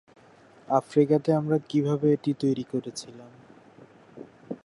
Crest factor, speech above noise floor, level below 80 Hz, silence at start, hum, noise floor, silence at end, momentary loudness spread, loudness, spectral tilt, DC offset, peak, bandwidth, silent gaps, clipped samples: 20 dB; 30 dB; -72 dBFS; 0.7 s; none; -54 dBFS; 0.1 s; 23 LU; -25 LUFS; -7.5 dB/octave; under 0.1%; -8 dBFS; 11.5 kHz; none; under 0.1%